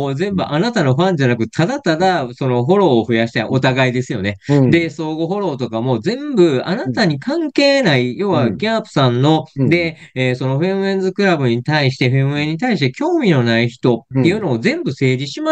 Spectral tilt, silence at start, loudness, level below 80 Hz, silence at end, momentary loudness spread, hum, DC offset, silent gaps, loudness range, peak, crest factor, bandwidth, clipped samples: -6.5 dB/octave; 0 s; -16 LUFS; -54 dBFS; 0 s; 6 LU; none; under 0.1%; none; 1 LU; -2 dBFS; 14 dB; 8.6 kHz; under 0.1%